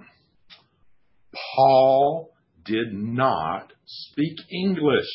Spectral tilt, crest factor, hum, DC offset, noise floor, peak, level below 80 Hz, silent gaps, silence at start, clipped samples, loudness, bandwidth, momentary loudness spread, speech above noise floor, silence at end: -10.5 dB/octave; 18 dB; none; under 0.1%; -64 dBFS; -6 dBFS; -60 dBFS; none; 1.35 s; under 0.1%; -22 LUFS; 5.8 kHz; 20 LU; 42 dB; 0 s